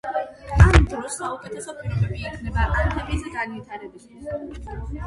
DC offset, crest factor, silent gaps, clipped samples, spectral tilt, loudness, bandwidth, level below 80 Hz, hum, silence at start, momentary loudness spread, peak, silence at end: under 0.1%; 22 dB; none; under 0.1%; -6 dB/octave; -23 LUFS; 11.5 kHz; -26 dBFS; none; 0.05 s; 20 LU; 0 dBFS; 0 s